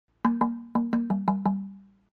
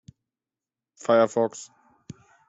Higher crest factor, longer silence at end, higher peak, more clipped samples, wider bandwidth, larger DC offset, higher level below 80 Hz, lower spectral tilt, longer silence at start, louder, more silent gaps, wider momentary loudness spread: about the same, 18 dB vs 20 dB; second, 0.3 s vs 0.85 s; about the same, -10 dBFS vs -8 dBFS; neither; second, 4.6 kHz vs 8 kHz; neither; first, -62 dBFS vs -72 dBFS; first, -10 dB/octave vs -5 dB/octave; second, 0.25 s vs 1.1 s; second, -28 LUFS vs -23 LUFS; neither; second, 5 LU vs 22 LU